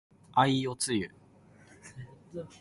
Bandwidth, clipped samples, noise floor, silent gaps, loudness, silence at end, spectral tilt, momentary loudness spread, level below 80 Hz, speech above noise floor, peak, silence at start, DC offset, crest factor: 11.5 kHz; under 0.1%; -58 dBFS; none; -29 LUFS; 0.15 s; -4.5 dB/octave; 23 LU; -64 dBFS; 29 dB; -12 dBFS; 0.35 s; under 0.1%; 22 dB